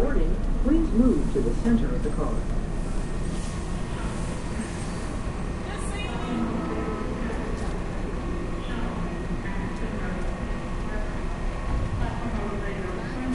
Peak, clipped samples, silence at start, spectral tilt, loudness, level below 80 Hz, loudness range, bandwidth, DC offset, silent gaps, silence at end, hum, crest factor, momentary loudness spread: -8 dBFS; under 0.1%; 0 s; -6.5 dB/octave; -29 LUFS; -30 dBFS; 6 LU; 11.5 kHz; under 0.1%; none; 0 s; none; 18 dB; 8 LU